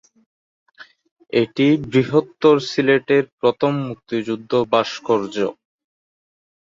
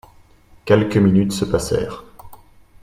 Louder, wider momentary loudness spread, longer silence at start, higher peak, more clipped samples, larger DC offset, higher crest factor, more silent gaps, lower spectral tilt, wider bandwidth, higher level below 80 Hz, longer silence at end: about the same, -19 LUFS vs -18 LUFS; second, 8 LU vs 18 LU; first, 0.8 s vs 0.65 s; about the same, -2 dBFS vs 0 dBFS; neither; neither; about the same, 18 dB vs 18 dB; first, 1.11-1.16 s, 3.33-3.38 s vs none; about the same, -6.5 dB/octave vs -6.5 dB/octave; second, 7.6 kHz vs 16 kHz; second, -60 dBFS vs -42 dBFS; first, 1.25 s vs 0.5 s